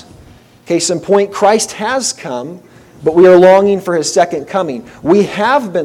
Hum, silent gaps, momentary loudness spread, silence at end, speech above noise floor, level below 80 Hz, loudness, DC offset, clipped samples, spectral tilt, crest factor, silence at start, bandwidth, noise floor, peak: none; none; 15 LU; 0 s; 30 dB; -50 dBFS; -12 LUFS; under 0.1%; 0.6%; -4.5 dB/octave; 12 dB; 0.7 s; 14 kHz; -41 dBFS; 0 dBFS